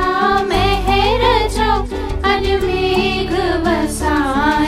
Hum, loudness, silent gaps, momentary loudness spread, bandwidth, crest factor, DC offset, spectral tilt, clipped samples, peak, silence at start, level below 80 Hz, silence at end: none; -16 LUFS; none; 3 LU; 16 kHz; 14 dB; under 0.1%; -5 dB/octave; under 0.1%; -2 dBFS; 0 s; -24 dBFS; 0 s